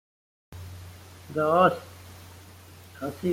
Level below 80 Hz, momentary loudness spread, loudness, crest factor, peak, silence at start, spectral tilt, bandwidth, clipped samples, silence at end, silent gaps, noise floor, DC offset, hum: -64 dBFS; 27 LU; -25 LUFS; 20 dB; -8 dBFS; 0.5 s; -6.5 dB/octave; 16.5 kHz; under 0.1%; 0 s; none; -48 dBFS; under 0.1%; none